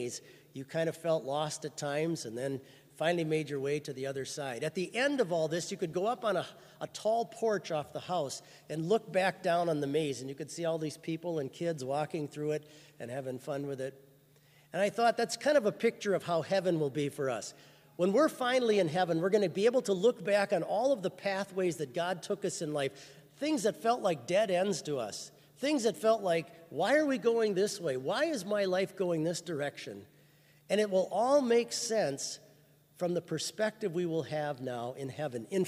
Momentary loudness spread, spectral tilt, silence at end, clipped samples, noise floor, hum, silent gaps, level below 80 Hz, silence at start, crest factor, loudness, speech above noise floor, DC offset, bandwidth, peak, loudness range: 11 LU; -4.5 dB/octave; 0 s; under 0.1%; -63 dBFS; none; none; -80 dBFS; 0 s; 18 dB; -32 LUFS; 31 dB; under 0.1%; 15.5 kHz; -16 dBFS; 5 LU